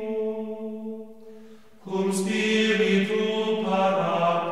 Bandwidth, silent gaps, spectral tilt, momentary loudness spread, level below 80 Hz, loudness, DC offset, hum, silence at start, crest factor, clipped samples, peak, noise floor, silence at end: 13.5 kHz; none; -5 dB/octave; 14 LU; -70 dBFS; -24 LUFS; 0.3%; none; 0 s; 14 dB; under 0.1%; -10 dBFS; -49 dBFS; 0 s